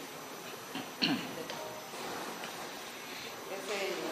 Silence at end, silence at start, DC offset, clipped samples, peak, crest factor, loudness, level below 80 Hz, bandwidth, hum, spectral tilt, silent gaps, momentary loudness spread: 0 s; 0 s; under 0.1%; under 0.1%; -14 dBFS; 26 dB; -38 LUFS; -78 dBFS; 16 kHz; none; -2.5 dB/octave; none; 11 LU